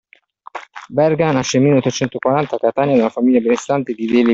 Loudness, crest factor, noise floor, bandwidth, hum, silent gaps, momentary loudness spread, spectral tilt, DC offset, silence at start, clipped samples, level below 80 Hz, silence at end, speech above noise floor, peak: -16 LUFS; 14 dB; -44 dBFS; 7.8 kHz; none; none; 12 LU; -6 dB/octave; under 0.1%; 0.55 s; under 0.1%; -56 dBFS; 0 s; 29 dB; -2 dBFS